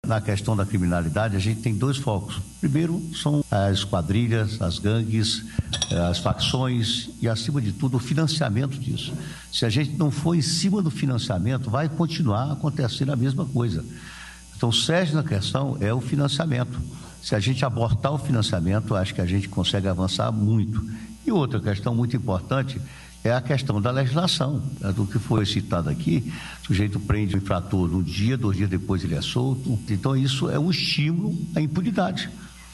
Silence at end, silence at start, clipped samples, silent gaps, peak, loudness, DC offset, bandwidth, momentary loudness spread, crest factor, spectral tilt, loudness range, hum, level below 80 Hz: 0 s; 0.05 s; under 0.1%; none; -4 dBFS; -24 LUFS; under 0.1%; 12.5 kHz; 6 LU; 20 dB; -6 dB/octave; 1 LU; none; -44 dBFS